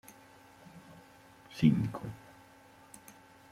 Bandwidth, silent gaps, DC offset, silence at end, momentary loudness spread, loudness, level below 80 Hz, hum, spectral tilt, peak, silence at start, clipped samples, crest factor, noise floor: 15.5 kHz; none; under 0.1%; 1.35 s; 28 LU; -31 LUFS; -64 dBFS; none; -7.5 dB/octave; -14 dBFS; 0.75 s; under 0.1%; 24 dB; -58 dBFS